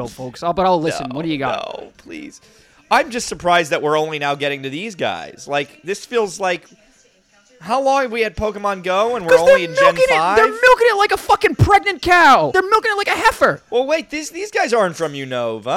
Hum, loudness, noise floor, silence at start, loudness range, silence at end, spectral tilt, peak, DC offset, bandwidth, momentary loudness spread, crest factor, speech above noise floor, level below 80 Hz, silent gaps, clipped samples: none; -16 LUFS; -54 dBFS; 0 s; 9 LU; 0 s; -4.5 dB/octave; 0 dBFS; under 0.1%; 16.5 kHz; 14 LU; 16 dB; 38 dB; -42 dBFS; none; under 0.1%